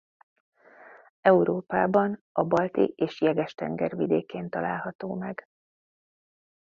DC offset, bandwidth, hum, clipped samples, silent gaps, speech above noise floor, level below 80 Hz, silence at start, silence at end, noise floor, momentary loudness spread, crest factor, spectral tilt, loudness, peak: under 0.1%; 7 kHz; none; under 0.1%; 1.10-1.23 s, 2.21-2.35 s, 4.95-4.99 s; 26 dB; -66 dBFS; 0.8 s; 1.35 s; -52 dBFS; 12 LU; 22 dB; -8.5 dB/octave; -26 LUFS; -6 dBFS